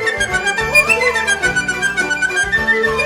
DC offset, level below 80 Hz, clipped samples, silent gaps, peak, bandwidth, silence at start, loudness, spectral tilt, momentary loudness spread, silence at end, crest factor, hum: under 0.1%; -38 dBFS; under 0.1%; none; -2 dBFS; over 20 kHz; 0 s; -14 LUFS; -2 dB/octave; 5 LU; 0 s; 14 dB; none